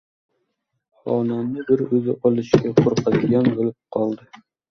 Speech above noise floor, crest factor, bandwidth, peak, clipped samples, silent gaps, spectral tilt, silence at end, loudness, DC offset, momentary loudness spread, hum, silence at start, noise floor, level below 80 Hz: 55 dB; 20 dB; 6.6 kHz; 0 dBFS; under 0.1%; none; -8 dB/octave; 0.35 s; -20 LUFS; under 0.1%; 8 LU; none; 1.05 s; -75 dBFS; -56 dBFS